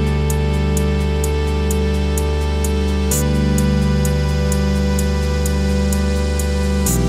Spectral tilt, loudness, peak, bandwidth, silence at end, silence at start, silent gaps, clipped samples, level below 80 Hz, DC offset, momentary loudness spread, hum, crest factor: -5.5 dB/octave; -18 LUFS; -4 dBFS; 16 kHz; 0 s; 0 s; none; under 0.1%; -20 dBFS; under 0.1%; 2 LU; none; 12 dB